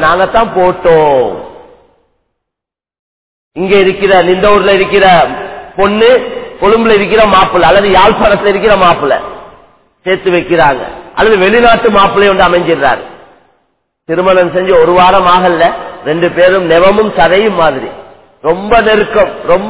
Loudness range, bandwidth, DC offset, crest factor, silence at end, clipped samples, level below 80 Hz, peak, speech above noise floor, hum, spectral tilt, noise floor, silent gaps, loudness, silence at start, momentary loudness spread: 4 LU; 4 kHz; under 0.1%; 8 dB; 0 s; 1%; -34 dBFS; 0 dBFS; 75 dB; none; -9 dB/octave; -82 dBFS; 2.99-3.51 s; -8 LUFS; 0 s; 11 LU